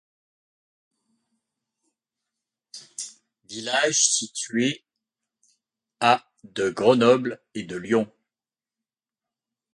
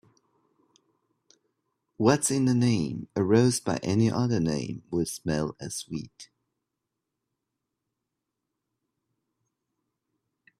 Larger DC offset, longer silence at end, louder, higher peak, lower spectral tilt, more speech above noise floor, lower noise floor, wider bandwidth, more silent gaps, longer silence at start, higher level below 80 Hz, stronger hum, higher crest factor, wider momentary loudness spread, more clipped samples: neither; second, 1.7 s vs 4.35 s; first, -22 LUFS vs -26 LUFS; about the same, -2 dBFS vs -4 dBFS; second, -2.5 dB/octave vs -5.5 dB/octave; first, over 68 dB vs 59 dB; first, under -90 dBFS vs -85 dBFS; second, 11.5 kHz vs 14.5 kHz; neither; first, 2.75 s vs 2 s; second, -70 dBFS vs -60 dBFS; neither; about the same, 24 dB vs 24 dB; first, 19 LU vs 12 LU; neither